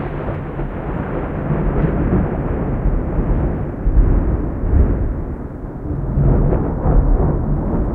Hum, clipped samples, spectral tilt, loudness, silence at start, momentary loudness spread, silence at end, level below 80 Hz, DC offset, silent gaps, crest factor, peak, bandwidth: none; under 0.1%; -12 dB/octave; -20 LUFS; 0 s; 8 LU; 0 s; -20 dBFS; under 0.1%; none; 14 dB; -2 dBFS; 3.2 kHz